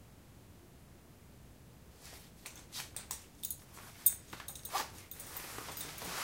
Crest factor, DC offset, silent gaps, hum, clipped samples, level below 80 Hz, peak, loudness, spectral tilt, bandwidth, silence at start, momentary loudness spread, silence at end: 34 dB; under 0.1%; none; none; under 0.1%; -62 dBFS; -10 dBFS; -39 LUFS; -1 dB/octave; 17 kHz; 0 s; 27 LU; 0 s